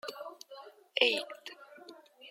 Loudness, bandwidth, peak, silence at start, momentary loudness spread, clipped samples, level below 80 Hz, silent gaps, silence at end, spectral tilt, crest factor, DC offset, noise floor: -30 LUFS; 16.5 kHz; -8 dBFS; 0.05 s; 25 LU; under 0.1%; under -90 dBFS; none; 0 s; -0.5 dB/octave; 28 dB; under 0.1%; -54 dBFS